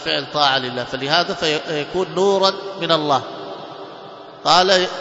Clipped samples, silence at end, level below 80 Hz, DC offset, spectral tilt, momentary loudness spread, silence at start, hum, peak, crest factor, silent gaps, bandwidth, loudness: under 0.1%; 0 s; -58 dBFS; under 0.1%; -3.5 dB/octave; 19 LU; 0 s; none; 0 dBFS; 20 dB; none; 8 kHz; -18 LUFS